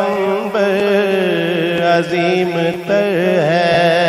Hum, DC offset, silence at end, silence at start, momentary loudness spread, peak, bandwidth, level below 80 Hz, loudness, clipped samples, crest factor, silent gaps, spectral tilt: none; under 0.1%; 0 s; 0 s; 4 LU; 0 dBFS; 15.5 kHz; -56 dBFS; -15 LUFS; under 0.1%; 14 dB; none; -6 dB/octave